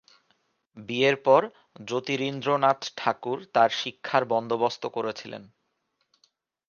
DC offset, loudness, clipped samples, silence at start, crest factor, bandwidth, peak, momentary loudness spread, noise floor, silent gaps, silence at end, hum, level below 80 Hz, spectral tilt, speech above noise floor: under 0.1%; -25 LUFS; under 0.1%; 0.75 s; 22 dB; 7.2 kHz; -6 dBFS; 17 LU; -76 dBFS; none; 1.25 s; none; -76 dBFS; -4.5 dB/octave; 50 dB